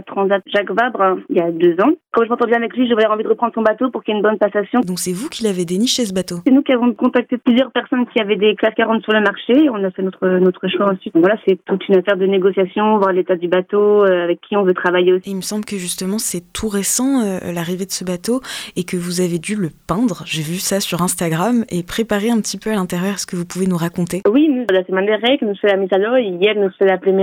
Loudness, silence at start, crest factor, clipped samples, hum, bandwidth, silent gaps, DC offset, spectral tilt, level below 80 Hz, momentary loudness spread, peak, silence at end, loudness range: -17 LUFS; 0.05 s; 12 dB; under 0.1%; none; 17 kHz; none; under 0.1%; -4.5 dB/octave; -52 dBFS; 7 LU; -4 dBFS; 0 s; 4 LU